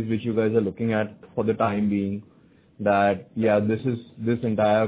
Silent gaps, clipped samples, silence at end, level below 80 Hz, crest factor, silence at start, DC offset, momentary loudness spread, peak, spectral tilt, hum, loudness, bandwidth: none; under 0.1%; 0 s; -56 dBFS; 16 dB; 0 s; under 0.1%; 8 LU; -8 dBFS; -11.5 dB/octave; none; -24 LUFS; 4 kHz